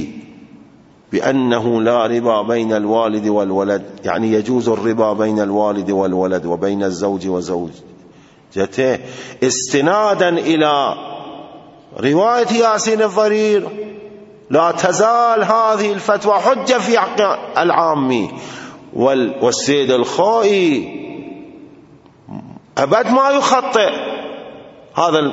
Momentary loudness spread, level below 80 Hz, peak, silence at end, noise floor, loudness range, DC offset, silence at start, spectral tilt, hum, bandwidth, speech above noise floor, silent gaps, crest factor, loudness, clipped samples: 17 LU; -60 dBFS; 0 dBFS; 0 s; -46 dBFS; 4 LU; under 0.1%; 0 s; -4.5 dB/octave; none; 8 kHz; 31 dB; none; 16 dB; -15 LUFS; under 0.1%